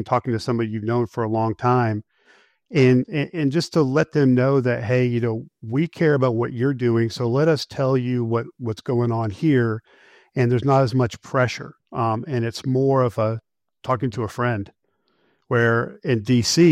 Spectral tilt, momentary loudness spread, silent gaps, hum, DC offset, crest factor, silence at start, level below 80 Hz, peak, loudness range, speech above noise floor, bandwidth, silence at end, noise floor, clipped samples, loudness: -6.5 dB/octave; 8 LU; none; none; under 0.1%; 16 dB; 0 s; -58 dBFS; -4 dBFS; 3 LU; 47 dB; 13.5 kHz; 0 s; -67 dBFS; under 0.1%; -21 LUFS